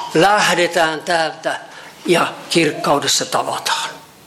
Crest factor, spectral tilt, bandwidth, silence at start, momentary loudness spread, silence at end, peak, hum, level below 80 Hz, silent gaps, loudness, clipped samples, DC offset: 14 dB; -3 dB/octave; 16.5 kHz; 0 s; 11 LU; 0.2 s; -4 dBFS; none; -58 dBFS; none; -16 LUFS; under 0.1%; under 0.1%